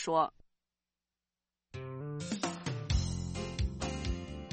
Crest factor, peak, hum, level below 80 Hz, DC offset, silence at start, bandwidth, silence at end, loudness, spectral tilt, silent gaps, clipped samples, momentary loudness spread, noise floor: 20 dB; -16 dBFS; none; -44 dBFS; under 0.1%; 0 s; 8.4 kHz; 0 s; -37 LUFS; -5 dB/octave; none; under 0.1%; 10 LU; under -90 dBFS